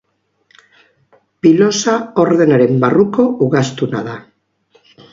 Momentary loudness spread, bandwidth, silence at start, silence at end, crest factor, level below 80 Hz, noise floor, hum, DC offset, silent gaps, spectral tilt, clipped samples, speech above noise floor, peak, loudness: 9 LU; 7.6 kHz; 1.45 s; 0.9 s; 14 dB; -58 dBFS; -59 dBFS; none; under 0.1%; none; -6 dB/octave; under 0.1%; 47 dB; 0 dBFS; -13 LUFS